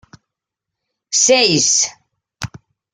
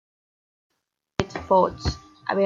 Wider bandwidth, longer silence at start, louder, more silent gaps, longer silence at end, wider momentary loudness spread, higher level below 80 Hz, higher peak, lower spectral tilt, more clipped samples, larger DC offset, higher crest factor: first, 11 kHz vs 7.6 kHz; about the same, 1.1 s vs 1.2 s; first, -13 LUFS vs -25 LUFS; neither; first, 0.45 s vs 0 s; first, 20 LU vs 11 LU; second, -56 dBFS vs -42 dBFS; first, 0 dBFS vs -4 dBFS; second, -1.5 dB/octave vs -6 dB/octave; neither; neither; about the same, 18 dB vs 22 dB